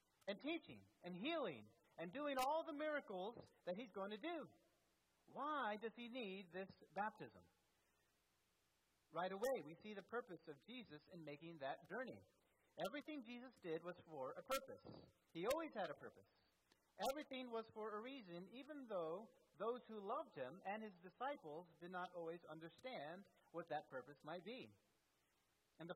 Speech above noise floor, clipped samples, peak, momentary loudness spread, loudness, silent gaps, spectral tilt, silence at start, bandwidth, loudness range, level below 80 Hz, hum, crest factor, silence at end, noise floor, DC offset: 34 dB; under 0.1%; -28 dBFS; 13 LU; -51 LUFS; none; -4.5 dB/octave; 0.25 s; 13 kHz; 6 LU; -86 dBFS; none; 24 dB; 0 s; -85 dBFS; under 0.1%